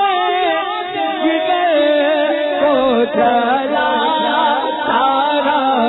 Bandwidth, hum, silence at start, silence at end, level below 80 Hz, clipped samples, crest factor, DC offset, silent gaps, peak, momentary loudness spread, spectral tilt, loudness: 4.1 kHz; none; 0 s; 0 s; -54 dBFS; under 0.1%; 12 dB; under 0.1%; none; -4 dBFS; 4 LU; -6.5 dB/octave; -15 LUFS